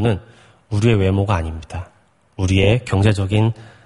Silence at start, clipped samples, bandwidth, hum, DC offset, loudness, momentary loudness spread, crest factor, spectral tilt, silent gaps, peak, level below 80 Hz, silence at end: 0 s; under 0.1%; 11.5 kHz; none; under 0.1%; -18 LUFS; 13 LU; 16 dB; -7 dB/octave; none; -2 dBFS; -38 dBFS; 0.2 s